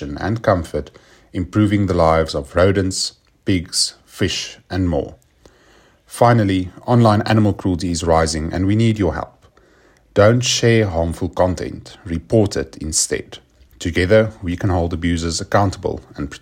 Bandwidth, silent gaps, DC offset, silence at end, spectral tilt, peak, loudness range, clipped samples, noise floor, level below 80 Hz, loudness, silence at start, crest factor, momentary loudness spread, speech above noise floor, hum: 16 kHz; none; under 0.1%; 0.05 s; -5 dB/octave; 0 dBFS; 3 LU; under 0.1%; -52 dBFS; -40 dBFS; -18 LUFS; 0 s; 18 dB; 13 LU; 35 dB; none